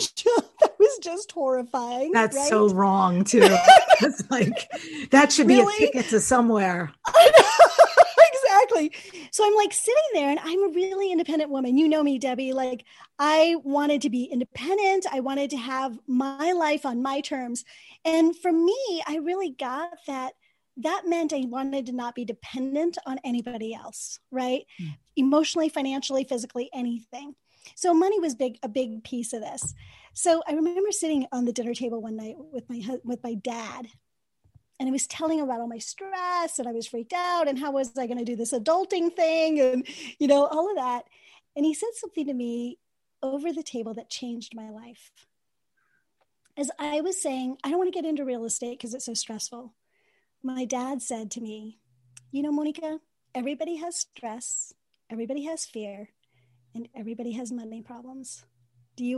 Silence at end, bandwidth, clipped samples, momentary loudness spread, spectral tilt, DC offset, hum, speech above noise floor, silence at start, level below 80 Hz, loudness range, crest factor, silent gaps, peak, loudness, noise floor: 0 s; 12.5 kHz; under 0.1%; 18 LU; -3.5 dB/octave; under 0.1%; none; 58 dB; 0 s; -68 dBFS; 17 LU; 24 dB; none; 0 dBFS; -23 LUFS; -82 dBFS